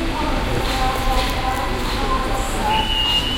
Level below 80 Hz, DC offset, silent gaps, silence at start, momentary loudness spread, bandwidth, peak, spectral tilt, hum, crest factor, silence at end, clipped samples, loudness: -24 dBFS; under 0.1%; none; 0 s; 5 LU; 17 kHz; -4 dBFS; -4 dB/octave; none; 14 dB; 0 s; under 0.1%; -20 LUFS